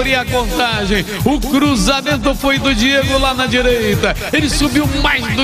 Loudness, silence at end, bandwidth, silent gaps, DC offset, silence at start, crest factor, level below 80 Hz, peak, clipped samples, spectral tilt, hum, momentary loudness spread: -14 LUFS; 0 s; 16 kHz; none; under 0.1%; 0 s; 14 dB; -24 dBFS; 0 dBFS; under 0.1%; -4 dB/octave; none; 3 LU